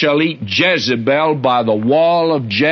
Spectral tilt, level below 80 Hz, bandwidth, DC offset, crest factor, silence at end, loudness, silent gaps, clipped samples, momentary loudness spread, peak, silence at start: -5.5 dB/octave; -58 dBFS; 6.6 kHz; under 0.1%; 12 dB; 0 s; -14 LUFS; none; under 0.1%; 3 LU; -2 dBFS; 0 s